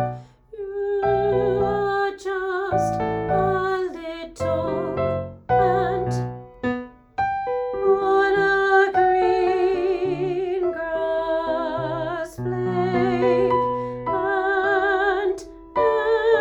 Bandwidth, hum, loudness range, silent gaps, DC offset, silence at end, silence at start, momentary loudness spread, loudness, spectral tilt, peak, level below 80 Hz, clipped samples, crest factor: 11 kHz; none; 4 LU; none; under 0.1%; 0 s; 0 s; 10 LU; -22 LUFS; -7 dB/octave; -6 dBFS; -48 dBFS; under 0.1%; 16 dB